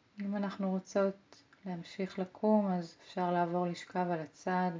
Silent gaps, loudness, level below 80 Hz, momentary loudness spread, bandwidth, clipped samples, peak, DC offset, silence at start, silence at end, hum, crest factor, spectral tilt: none; -35 LUFS; -80 dBFS; 13 LU; 7.6 kHz; under 0.1%; -16 dBFS; under 0.1%; 0.15 s; 0 s; none; 18 dB; -7 dB/octave